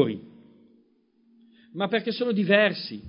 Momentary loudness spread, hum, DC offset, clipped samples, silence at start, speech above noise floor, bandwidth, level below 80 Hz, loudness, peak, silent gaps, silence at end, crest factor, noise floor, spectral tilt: 16 LU; none; under 0.1%; under 0.1%; 0 s; 40 dB; 5.4 kHz; -68 dBFS; -24 LUFS; -4 dBFS; none; 0 s; 22 dB; -64 dBFS; -9.5 dB/octave